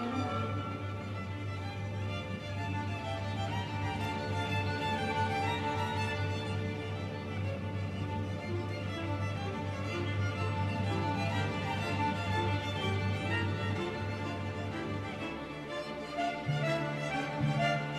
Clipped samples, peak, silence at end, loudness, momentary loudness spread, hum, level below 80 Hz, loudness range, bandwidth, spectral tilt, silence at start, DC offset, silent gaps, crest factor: under 0.1%; -18 dBFS; 0 s; -35 LUFS; 6 LU; none; -58 dBFS; 4 LU; 12 kHz; -6 dB/octave; 0 s; under 0.1%; none; 16 dB